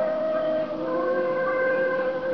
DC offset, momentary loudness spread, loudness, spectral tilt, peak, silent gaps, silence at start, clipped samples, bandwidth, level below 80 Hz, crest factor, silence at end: 0.3%; 3 LU; -25 LUFS; -4 dB/octave; -14 dBFS; none; 0 s; under 0.1%; 6 kHz; -62 dBFS; 10 dB; 0 s